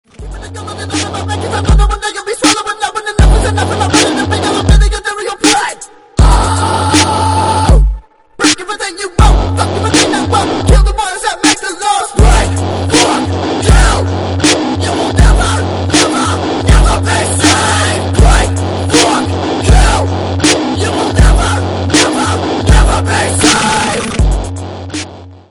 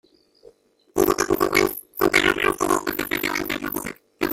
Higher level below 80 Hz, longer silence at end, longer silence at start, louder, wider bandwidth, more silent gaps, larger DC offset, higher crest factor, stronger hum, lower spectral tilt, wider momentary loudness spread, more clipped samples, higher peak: first, -14 dBFS vs -48 dBFS; first, 0.15 s vs 0 s; second, 0.2 s vs 0.95 s; first, -11 LUFS vs -22 LUFS; second, 11.5 kHz vs 17 kHz; neither; first, 0.1% vs under 0.1%; second, 10 dB vs 20 dB; neither; about the same, -4 dB/octave vs -3 dB/octave; second, 8 LU vs 11 LU; first, 0.7% vs under 0.1%; about the same, 0 dBFS vs -2 dBFS